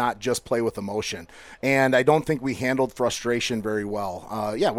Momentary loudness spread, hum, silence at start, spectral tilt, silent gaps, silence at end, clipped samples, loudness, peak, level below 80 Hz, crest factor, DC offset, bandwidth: 11 LU; none; 0 s; -4.5 dB/octave; none; 0 s; under 0.1%; -24 LUFS; -6 dBFS; -54 dBFS; 18 dB; under 0.1%; 16.5 kHz